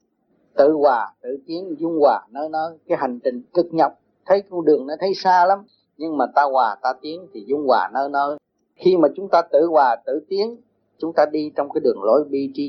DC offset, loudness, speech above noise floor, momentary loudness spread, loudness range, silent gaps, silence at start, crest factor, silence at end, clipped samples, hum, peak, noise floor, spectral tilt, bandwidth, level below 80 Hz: under 0.1%; -20 LUFS; 45 dB; 11 LU; 2 LU; none; 0.55 s; 18 dB; 0 s; under 0.1%; none; -2 dBFS; -64 dBFS; -6.5 dB/octave; 6.4 kHz; -74 dBFS